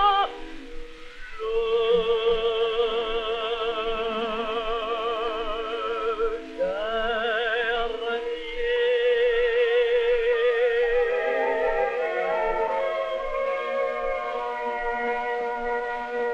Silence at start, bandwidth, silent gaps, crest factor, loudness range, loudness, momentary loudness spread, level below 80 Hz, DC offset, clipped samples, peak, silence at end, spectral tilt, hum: 0 s; 7.6 kHz; none; 16 dB; 5 LU; -25 LUFS; 7 LU; -44 dBFS; under 0.1%; under 0.1%; -10 dBFS; 0 s; -4 dB/octave; none